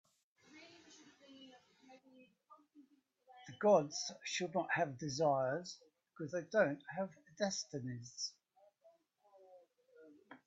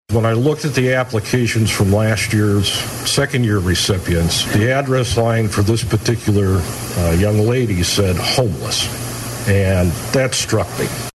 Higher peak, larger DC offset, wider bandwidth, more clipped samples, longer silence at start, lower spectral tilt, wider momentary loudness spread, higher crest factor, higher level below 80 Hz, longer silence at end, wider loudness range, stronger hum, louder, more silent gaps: second, -18 dBFS vs -6 dBFS; neither; second, 8 kHz vs 13.5 kHz; neither; first, 0.55 s vs 0.1 s; about the same, -4 dB/octave vs -5 dB/octave; first, 26 LU vs 4 LU; first, 22 dB vs 10 dB; second, -84 dBFS vs -36 dBFS; about the same, 0.1 s vs 0.05 s; first, 8 LU vs 1 LU; neither; second, -38 LUFS vs -16 LUFS; neither